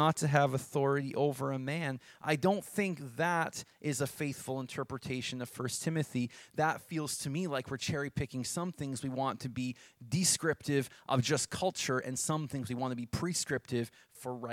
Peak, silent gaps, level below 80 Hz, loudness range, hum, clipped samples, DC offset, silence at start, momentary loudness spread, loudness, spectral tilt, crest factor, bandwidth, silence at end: -10 dBFS; none; -64 dBFS; 4 LU; none; under 0.1%; under 0.1%; 0 s; 9 LU; -34 LUFS; -4.5 dB/octave; 24 dB; 16.5 kHz; 0 s